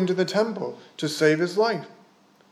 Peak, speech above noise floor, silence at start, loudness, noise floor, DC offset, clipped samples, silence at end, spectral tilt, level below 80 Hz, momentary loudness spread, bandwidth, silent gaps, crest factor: -8 dBFS; 33 dB; 0 s; -24 LUFS; -57 dBFS; under 0.1%; under 0.1%; 0.6 s; -5 dB/octave; -84 dBFS; 12 LU; 15 kHz; none; 18 dB